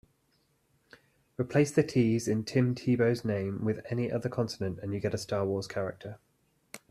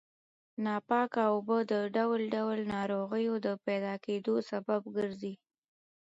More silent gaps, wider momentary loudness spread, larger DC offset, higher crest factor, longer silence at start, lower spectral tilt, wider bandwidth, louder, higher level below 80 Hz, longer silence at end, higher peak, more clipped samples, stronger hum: neither; first, 11 LU vs 7 LU; neither; about the same, 18 dB vs 16 dB; first, 1.4 s vs 0.6 s; about the same, -6.5 dB/octave vs -7 dB/octave; first, 14 kHz vs 8 kHz; first, -30 LUFS vs -33 LUFS; first, -64 dBFS vs -74 dBFS; second, 0.15 s vs 0.65 s; first, -12 dBFS vs -16 dBFS; neither; neither